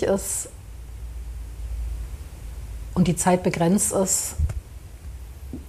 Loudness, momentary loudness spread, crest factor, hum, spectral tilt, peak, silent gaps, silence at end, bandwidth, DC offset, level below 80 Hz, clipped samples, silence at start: -23 LUFS; 20 LU; 18 dB; none; -5 dB/octave; -8 dBFS; none; 0 s; 15.5 kHz; under 0.1%; -34 dBFS; under 0.1%; 0 s